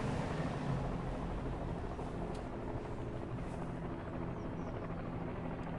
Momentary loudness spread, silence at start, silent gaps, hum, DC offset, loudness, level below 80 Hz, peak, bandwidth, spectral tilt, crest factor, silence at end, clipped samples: 4 LU; 0 s; none; none; under 0.1%; -41 LUFS; -48 dBFS; -26 dBFS; 11.5 kHz; -7.5 dB/octave; 14 dB; 0 s; under 0.1%